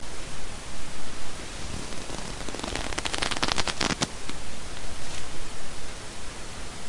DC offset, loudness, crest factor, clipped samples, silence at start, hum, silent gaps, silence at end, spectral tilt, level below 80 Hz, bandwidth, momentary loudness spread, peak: under 0.1%; -33 LUFS; 22 dB; under 0.1%; 0 s; none; none; 0 s; -2.5 dB/octave; -42 dBFS; 11.5 kHz; 12 LU; -2 dBFS